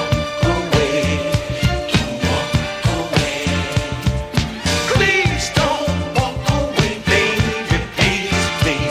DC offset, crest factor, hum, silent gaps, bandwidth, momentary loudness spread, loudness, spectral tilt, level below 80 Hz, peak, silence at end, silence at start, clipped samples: under 0.1%; 18 dB; none; none; 16 kHz; 5 LU; -18 LUFS; -4.5 dB/octave; -28 dBFS; 0 dBFS; 0 s; 0 s; under 0.1%